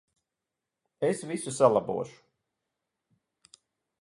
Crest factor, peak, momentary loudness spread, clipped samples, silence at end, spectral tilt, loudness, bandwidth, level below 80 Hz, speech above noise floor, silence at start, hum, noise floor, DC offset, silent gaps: 24 dB; -8 dBFS; 12 LU; under 0.1%; 1.9 s; -5.5 dB/octave; -28 LUFS; 11.5 kHz; -72 dBFS; 60 dB; 1 s; none; -88 dBFS; under 0.1%; none